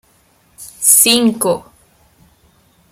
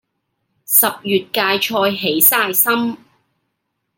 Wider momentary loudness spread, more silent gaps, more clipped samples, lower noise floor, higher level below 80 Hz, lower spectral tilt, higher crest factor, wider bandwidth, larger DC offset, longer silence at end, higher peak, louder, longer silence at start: first, 11 LU vs 8 LU; neither; neither; second, -54 dBFS vs -73 dBFS; first, -58 dBFS vs -68 dBFS; about the same, -1.5 dB/octave vs -2 dB/octave; about the same, 18 dB vs 18 dB; first, over 20 kHz vs 17 kHz; neither; first, 1.3 s vs 1 s; about the same, 0 dBFS vs 0 dBFS; first, -11 LUFS vs -14 LUFS; about the same, 0.6 s vs 0.7 s